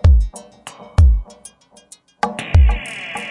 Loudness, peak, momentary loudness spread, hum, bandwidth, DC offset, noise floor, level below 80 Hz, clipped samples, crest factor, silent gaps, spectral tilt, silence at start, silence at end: -18 LUFS; 0 dBFS; 22 LU; none; 11.5 kHz; under 0.1%; -47 dBFS; -18 dBFS; under 0.1%; 16 dB; none; -6 dB/octave; 0.05 s; 0 s